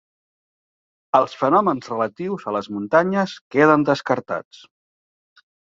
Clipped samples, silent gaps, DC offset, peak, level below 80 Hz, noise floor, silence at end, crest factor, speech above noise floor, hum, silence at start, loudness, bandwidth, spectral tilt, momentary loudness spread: under 0.1%; 3.41-3.51 s; under 0.1%; -2 dBFS; -64 dBFS; under -90 dBFS; 1.2 s; 20 dB; over 70 dB; none; 1.15 s; -20 LUFS; 7.6 kHz; -6.5 dB/octave; 10 LU